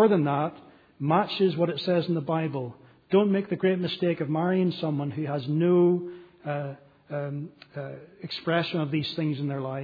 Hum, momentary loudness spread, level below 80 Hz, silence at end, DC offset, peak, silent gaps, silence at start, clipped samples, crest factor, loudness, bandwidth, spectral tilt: none; 15 LU; -72 dBFS; 0 s; under 0.1%; -8 dBFS; none; 0 s; under 0.1%; 18 dB; -27 LUFS; 5 kHz; -9 dB/octave